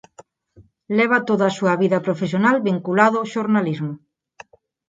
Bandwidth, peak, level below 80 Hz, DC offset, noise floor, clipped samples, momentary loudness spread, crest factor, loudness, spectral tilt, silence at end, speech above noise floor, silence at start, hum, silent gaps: 7.8 kHz; 0 dBFS; -66 dBFS; under 0.1%; -53 dBFS; under 0.1%; 8 LU; 20 dB; -19 LUFS; -6.5 dB/octave; 0.9 s; 34 dB; 0.2 s; none; none